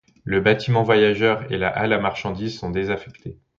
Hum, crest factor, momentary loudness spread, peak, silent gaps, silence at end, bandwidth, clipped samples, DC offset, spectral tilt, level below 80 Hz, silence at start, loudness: none; 18 dB; 11 LU; -2 dBFS; none; 0.25 s; 7.4 kHz; under 0.1%; under 0.1%; -7 dB/octave; -48 dBFS; 0.25 s; -21 LUFS